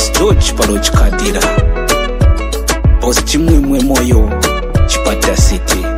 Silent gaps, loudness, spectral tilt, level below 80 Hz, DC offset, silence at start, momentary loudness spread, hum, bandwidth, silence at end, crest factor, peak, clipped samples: none; -12 LUFS; -4.5 dB/octave; -14 dBFS; under 0.1%; 0 s; 3 LU; none; 16 kHz; 0 s; 10 dB; 0 dBFS; under 0.1%